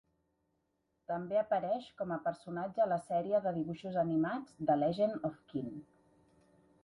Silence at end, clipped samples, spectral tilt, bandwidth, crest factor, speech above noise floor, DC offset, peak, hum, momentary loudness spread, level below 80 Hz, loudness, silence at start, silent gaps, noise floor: 1 s; under 0.1%; -8 dB/octave; 11 kHz; 18 dB; 46 dB; under 0.1%; -18 dBFS; none; 10 LU; -72 dBFS; -35 LUFS; 1.1 s; none; -81 dBFS